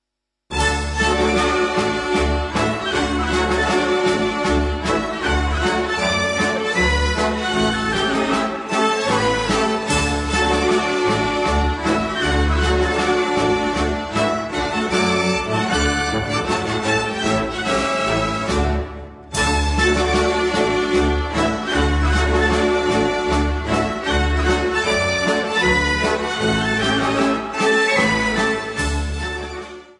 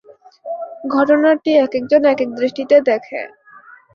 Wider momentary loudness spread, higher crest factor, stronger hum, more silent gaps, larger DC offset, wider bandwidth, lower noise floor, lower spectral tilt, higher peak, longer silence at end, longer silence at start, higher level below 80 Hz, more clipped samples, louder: second, 4 LU vs 15 LU; about the same, 16 dB vs 14 dB; neither; neither; neither; first, 11.5 kHz vs 6.6 kHz; first, -80 dBFS vs -44 dBFS; second, -4.5 dB/octave vs -6 dB/octave; about the same, -4 dBFS vs -2 dBFS; second, 0.1 s vs 0.65 s; about the same, 0.5 s vs 0.45 s; first, -28 dBFS vs -64 dBFS; neither; second, -19 LUFS vs -15 LUFS